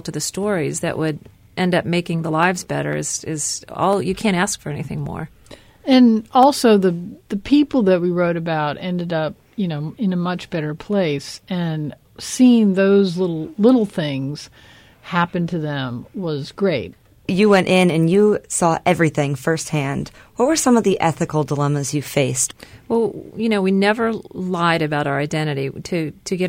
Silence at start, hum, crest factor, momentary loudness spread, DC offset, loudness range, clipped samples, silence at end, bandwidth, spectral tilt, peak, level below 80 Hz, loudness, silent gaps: 0.05 s; none; 16 dB; 12 LU; under 0.1%; 5 LU; under 0.1%; 0 s; 16.5 kHz; -5 dB/octave; -2 dBFS; -52 dBFS; -19 LUFS; none